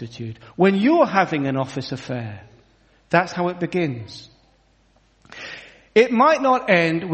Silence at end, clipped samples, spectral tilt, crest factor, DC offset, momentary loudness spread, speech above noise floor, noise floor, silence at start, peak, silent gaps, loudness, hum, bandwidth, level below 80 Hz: 0 s; under 0.1%; -6.5 dB/octave; 20 dB; under 0.1%; 19 LU; 39 dB; -59 dBFS; 0 s; 0 dBFS; none; -19 LUFS; none; 8.4 kHz; -60 dBFS